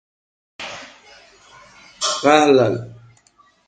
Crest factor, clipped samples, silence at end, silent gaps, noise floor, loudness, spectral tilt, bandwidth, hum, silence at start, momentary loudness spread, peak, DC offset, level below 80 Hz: 22 dB; under 0.1%; 0.75 s; none; -56 dBFS; -16 LUFS; -4 dB/octave; 9.4 kHz; none; 0.6 s; 22 LU; 0 dBFS; under 0.1%; -60 dBFS